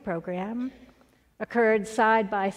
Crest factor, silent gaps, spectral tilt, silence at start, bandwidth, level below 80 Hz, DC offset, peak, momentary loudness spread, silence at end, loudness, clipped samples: 18 dB; none; -5.5 dB/octave; 0.05 s; 13 kHz; -62 dBFS; under 0.1%; -10 dBFS; 13 LU; 0 s; -25 LUFS; under 0.1%